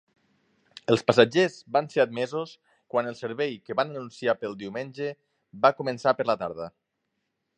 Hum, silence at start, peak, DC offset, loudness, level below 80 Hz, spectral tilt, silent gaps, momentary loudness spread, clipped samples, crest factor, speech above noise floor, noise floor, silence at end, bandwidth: none; 0.9 s; -4 dBFS; under 0.1%; -26 LUFS; -70 dBFS; -5.5 dB/octave; none; 14 LU; under 0.1%; 24 dB; 53 dB; -79 dBFS; 0.9 s; 9.8 kHz